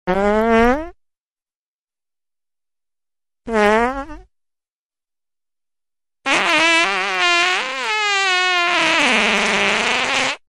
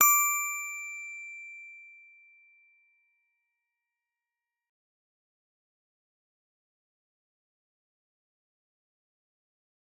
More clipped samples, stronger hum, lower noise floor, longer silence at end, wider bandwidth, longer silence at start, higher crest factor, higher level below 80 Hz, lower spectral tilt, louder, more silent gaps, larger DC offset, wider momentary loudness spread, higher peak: neither; neither; about the same, under -90 dBFS vs under -90 dBFS; second, 0.1 s vs 8.05 s; second, 15 kHz vs 19.5 kHz; about the same, 0.05 s vs 0 s; second, 18 dB vs 30 dB; first, -42 dBFS vs under -90 dBFS; first, -2.5 dB/octave vs 3 dB/octave; first, -15 LUFS vs -28 LUFS; first, 1.21-1.25 s, 1.32-1.36 s, 1.55-1.87 s, 4.72-4.90 s vs none; neither; second, 9 LU vs 24 LU; first, -2 dBFS vs -8 dBFS